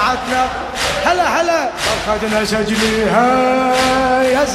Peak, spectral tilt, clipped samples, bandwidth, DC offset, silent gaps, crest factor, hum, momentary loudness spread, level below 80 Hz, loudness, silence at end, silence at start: -2 dBFS; -3.5 dB/octave; under 0.1%; 15.5 kHz; under 0.1%; none; 14 dB; none; 4 LU; -36 dBFS; -15 LUFS; 0 s; 0 s